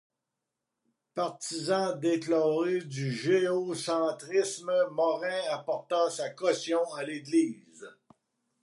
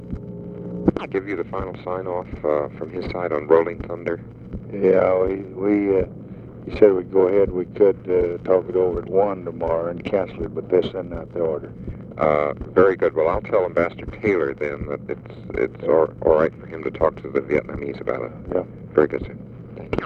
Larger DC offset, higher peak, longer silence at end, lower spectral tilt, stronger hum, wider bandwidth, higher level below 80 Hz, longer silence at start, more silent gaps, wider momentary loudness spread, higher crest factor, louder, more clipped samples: neither; second, -14 dBFS vs 0 dBFS; first, 0.7 s vs 0 s; second, -4.5 dB/octave vs -9 dB/octave; neither; first, 11.5 kHz vs 5.8 kHz; second, -86 dBFS vs -42 dBFS; first, 1.15 s vs 0 s; neither; second, 8 LU vs 15 LU; about the same, 16 dB vs 20 dB; second, -30 LUFS vs -22 LUFS; neither